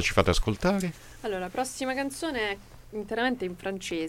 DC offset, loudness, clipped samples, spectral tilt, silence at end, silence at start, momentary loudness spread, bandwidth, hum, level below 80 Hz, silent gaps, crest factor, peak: under 0.1%; -30 LUFS; under 0.1%; -4.5 dB/octave; 0 s; 0 s; 11 LU; 17 kHz; none; -40 dBFS; none; 22 dB; -6 dBFS